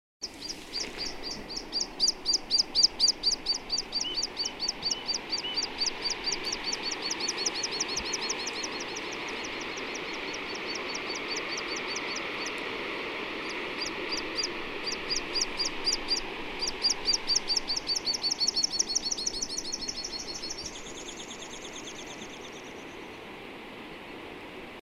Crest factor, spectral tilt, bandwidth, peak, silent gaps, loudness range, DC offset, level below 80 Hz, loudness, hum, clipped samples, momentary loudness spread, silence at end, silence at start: 24 dB; 0 dB/octave; 16 kHz; -10 dBFS; none; 11 LU; under 0.1%; -54 dBFS; -29 LUFS; none; under 0.1%; 15 LU; 0.05 s; 0.2 s